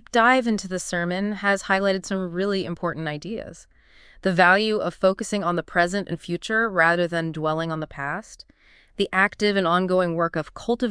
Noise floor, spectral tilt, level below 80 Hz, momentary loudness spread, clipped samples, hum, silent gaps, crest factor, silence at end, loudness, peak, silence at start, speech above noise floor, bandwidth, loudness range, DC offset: -51 dBFS; -5 dB/octave; -54 dBFS; 11 LU; under 0.1%; none; none; 20 dB; 0 s; -23 LUFS; -2 dBFS; 0.15 s; 29 dB; 10.5 kHz; 4 LU; under 0.1%